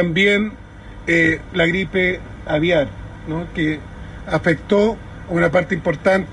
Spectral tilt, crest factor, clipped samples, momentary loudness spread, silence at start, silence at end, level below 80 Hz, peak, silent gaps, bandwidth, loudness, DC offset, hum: -6.5 dB/octave; 16 dB; under 0.1%; 14 LU; 0 s; 0 s; -38 dBFS; -4 dBFS; none; 11 kHz; -19 LUFS; under 0.1%; none